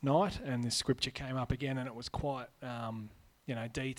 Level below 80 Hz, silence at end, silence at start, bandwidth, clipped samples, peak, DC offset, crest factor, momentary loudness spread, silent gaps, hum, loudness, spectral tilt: -54 dBFS; 0 s; 0 s; 16 kHz; under 0.1%; -18 dBFS; under 0.1%; 18 dB; 11 LU; none; none; -37 LUFS; -5 dB/octave